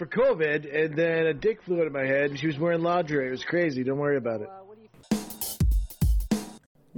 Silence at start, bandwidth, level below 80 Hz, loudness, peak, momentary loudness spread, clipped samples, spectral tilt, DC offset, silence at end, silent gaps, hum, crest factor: 0 s; 18 kHz; -34 dBFS; -27 LUFS; -12 dBFS; 7 LU; under 0.1%; -6 dB/octave; under 0.1%; 0.4 s; none; none; 14 dB